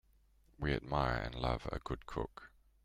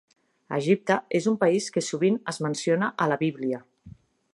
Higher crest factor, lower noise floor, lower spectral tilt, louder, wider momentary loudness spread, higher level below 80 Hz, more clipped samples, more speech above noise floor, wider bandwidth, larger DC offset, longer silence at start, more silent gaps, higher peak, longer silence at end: about the same, 20 dB vs 20 dB; first, -69 dBFS vs -50 dBFS; first, -7 dB/octave vs -5.5 dB/octave; second, -39 LUFS vs -26 LUFS; about the same, 8 LU vs 8 LU; first, -48 dBFS vs -68 dBFS; neither; first, 31 dB vs 26 dB; about the same, 12.5 kHz vs 11.5 kHz; neither; about the same, 0.6 s vs 0.5 s; neither; second, -20 dBFS vs -6 dBFS; about the same, 0.35 s vs 0.45 s